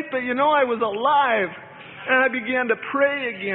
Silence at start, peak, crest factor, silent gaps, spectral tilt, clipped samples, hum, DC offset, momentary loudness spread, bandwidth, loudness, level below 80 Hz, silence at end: 0 s; -6 dBFS; 16 dB; none; -9 dB/octave; under 0.1%; none; under 0.1%; 10 LU; 4.1 kHz; -21 LUFS; -68 dBFS; 0 s